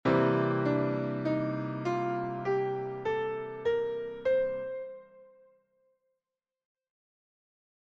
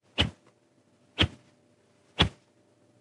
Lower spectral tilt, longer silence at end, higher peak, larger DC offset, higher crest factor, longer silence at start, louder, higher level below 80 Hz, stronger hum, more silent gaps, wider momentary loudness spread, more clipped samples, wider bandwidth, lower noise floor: first, -8.5 dB/octave vs -4.5 dB/octave; first, 2.6 s vs 0.7 s; second, -14 dBFS vs -8 dBFS; neither; second, 18 dB vs 26 dB; about the same, 0.05 s vs 0.15 s; second, -31 LUFS vs -28 LUFS; second, -66 dBFS vs -46 dBFS; neither; neither; second, 8 LU vs 13 LU; neither; second, 7.4 kHz vs 11.5 kHz; first, under -90 dBFS vs -65 dBFS